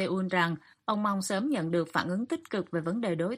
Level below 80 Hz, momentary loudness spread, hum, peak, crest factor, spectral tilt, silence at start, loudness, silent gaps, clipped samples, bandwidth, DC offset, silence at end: -72 dBFS; 5 LU; none; -10 dBFS; 20 dB; -5.5 dB/octave; 0 s; -30 LUFS; none; under 0.1%; 15.5 kHz; under 0.1%; 0 s